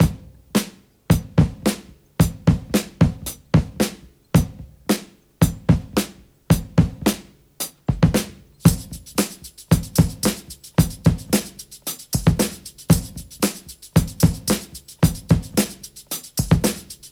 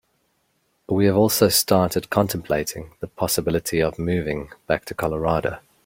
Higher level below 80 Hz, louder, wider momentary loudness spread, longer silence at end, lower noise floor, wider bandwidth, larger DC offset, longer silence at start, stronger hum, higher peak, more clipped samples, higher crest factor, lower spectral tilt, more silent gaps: first, -34 dBFS vs -46 dBFS; about the same, -21 LUFS vs -21 LUFS; about the same, 14 LU vs 12 LU; second, 0.05 s vs 0.25 s; second, -37 dBFS vs -68 dBFS; about the same, 18 kHz vs 17 kHz; neither; second, 0 s vs 0.9 s; neither; about the same, -2 dBFS vs -2 dBFS; neither; about the same, 20 dB vs 20 dB; about the same, -5.5 dB/octave vs -4.5 dB/octave; neither